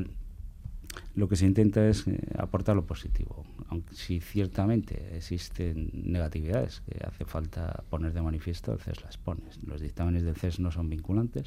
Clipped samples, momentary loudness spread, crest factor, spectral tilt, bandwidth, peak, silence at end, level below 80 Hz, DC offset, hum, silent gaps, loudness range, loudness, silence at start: under 0.1%; 14 LU; 18 dB; -7.5 dB/octave; 15 kHz; -12 dBFS; 0 s; -40 dBFS; under 0.1%; none; none; 6 LU; -31 LUFS; 0 s